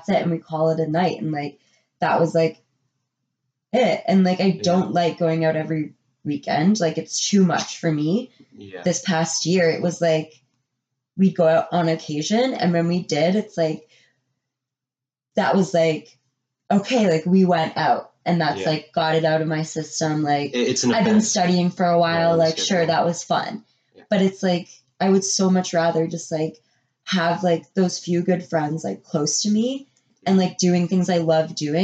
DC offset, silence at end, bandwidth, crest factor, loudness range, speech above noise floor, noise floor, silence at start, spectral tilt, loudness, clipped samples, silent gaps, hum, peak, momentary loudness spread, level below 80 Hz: under 0.1%; 0 s; 8.8 kHz; 14 dB; 4 LU; 69 dB; -89 dBFS; 0.1 s; -5 dB/octave; -21 LUFS; under 0.1%; none; none; -6 dBFS; 9 LU; -68 dBFS